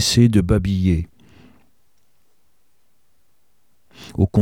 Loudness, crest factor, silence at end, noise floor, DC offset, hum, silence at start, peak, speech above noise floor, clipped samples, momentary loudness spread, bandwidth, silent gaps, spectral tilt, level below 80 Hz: -18 LUFS; 18 dB; 0 s; -68 dBFS; 0.3%; none; 0 s; -2 dBFS; 52 dB; under 0.1%; 20 LU; 16.5 kHz; none; -6 dB/octave; -36 dBFS